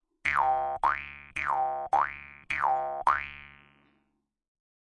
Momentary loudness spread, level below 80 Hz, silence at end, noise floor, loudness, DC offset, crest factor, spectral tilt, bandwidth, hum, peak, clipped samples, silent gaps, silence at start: 10 LU; -58 dBFS; 1.45 s; -77 dBFS; -29 LUFS; under 0.1%; 22 dB; -3.5 dB/octave; 11 kHz; none; -10 dBFS; under 0.1%; none; 0.25 s